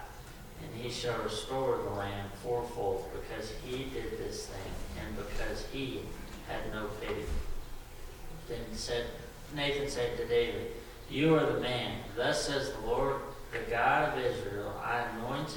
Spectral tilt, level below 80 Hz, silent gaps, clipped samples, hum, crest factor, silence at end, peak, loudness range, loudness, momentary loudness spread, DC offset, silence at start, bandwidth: -4.5 dB/octave; -46 dBFS; none; under 0.1%; none; 20 dB; 0 s; -16 dBFS; 8 LU; -35 LUFS; 15 LU; under 0.1%; 0 s; 19 kHz